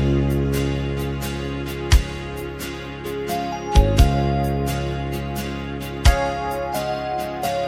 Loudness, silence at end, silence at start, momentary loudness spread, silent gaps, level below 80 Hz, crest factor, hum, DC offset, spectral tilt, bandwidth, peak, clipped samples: -23 LUFS; 0 s; 0 s; 11 LU; none; -24 dBFS; 20 dB; none; under 0.1%; -6 dB/octave; 16 kHz; -2 dBFS; under 0.1%